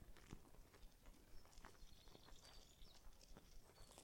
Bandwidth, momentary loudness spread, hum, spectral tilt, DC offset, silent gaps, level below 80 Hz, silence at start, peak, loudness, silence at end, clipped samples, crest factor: 16.5 kHz; 5 LU; none; -3.5 dB/octave; under 0.1%; none; -66 dBFS; 0 s; -40 dBFS; -67 LUFS; 0 s; under 0.1%; 22 dB